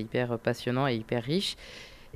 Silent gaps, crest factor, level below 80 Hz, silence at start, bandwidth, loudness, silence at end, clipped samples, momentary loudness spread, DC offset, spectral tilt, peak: none; 16 dB; -56 dBFS; 0 s; 14.5 kHz; -30 LUFS; 0.05 s; under 0.1%; 14 LU; under 0.1%; -5.5 dB/octave; -14 dBFS